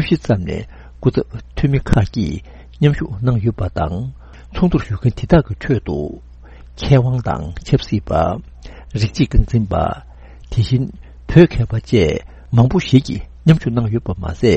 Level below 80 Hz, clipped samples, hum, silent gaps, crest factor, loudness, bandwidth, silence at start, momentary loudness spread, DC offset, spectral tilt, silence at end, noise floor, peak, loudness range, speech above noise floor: -28 dBFS; 0.1%; none; none; 16 dB; -17 LUFS; 8.4 kHz; 0 s; 13 LU; under 0.1%; -8 dB/octave; 0 s; -38 dBFS; 0 dBFS; 4 LU; 22 dB